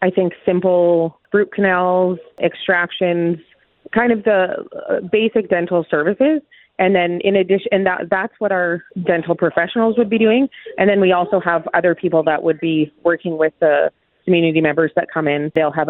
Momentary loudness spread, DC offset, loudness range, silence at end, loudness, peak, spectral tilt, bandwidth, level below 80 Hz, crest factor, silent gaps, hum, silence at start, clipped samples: 6 LU; under 0.1%; 2 LU; 0 s; -17 LUFS; 0 dBFS; -10.5 dB/octave; 4.1 kHz; -60 dBFS; 16 dB; none; none; 0 s; under 0.1%